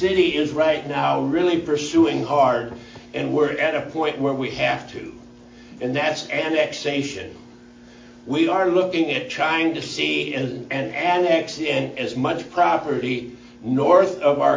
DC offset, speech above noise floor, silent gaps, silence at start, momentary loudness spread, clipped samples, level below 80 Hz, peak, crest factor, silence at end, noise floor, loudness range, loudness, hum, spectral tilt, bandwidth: under 0.1%; 24 dB; none; 0 s; 10 LU; under 0.1%; -56 dBFS; -4 dBFS; 18 dB; 0 s; -45 dBFS; 4 LU; -21 LUFS; none; -5 dB/octave; 7.6 kHz